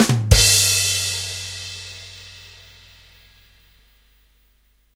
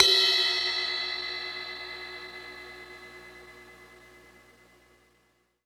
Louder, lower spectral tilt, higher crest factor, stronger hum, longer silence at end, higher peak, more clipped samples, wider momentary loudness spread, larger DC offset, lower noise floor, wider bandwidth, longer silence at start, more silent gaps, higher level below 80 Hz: first, -16 LUFS vs -26 LUFS; first, -2.5 dB/octave vs 0 dB/octave; second, 22 dB vs 28 dB; first, 50 Hz at -60 dBFS vs none; first, 2.45 s vs 1.5 s; first, 0 dBFS vs -4 dBFS; neither; about the same, 25 LU vs 26 LU; neither; second, -60 dBFS vs -69 dBFS; second, 16 kHz vs 19 kHz; about the same, 0 s vs 0 s; neither; first, -32 dBFS vs -64 dBFS